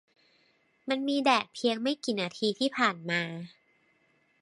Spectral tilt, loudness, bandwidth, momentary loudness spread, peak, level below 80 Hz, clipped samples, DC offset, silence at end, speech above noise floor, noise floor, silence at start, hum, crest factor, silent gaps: -4 dB/octave; -29 LUFS; 11.5 kHz; 12 LU; -8 dBFS; -82 dBFS; under 0.1%; under 0.1%; 0.95 s; 40 dB; -69 dBFS; 0.85 s; none; 22 dB; none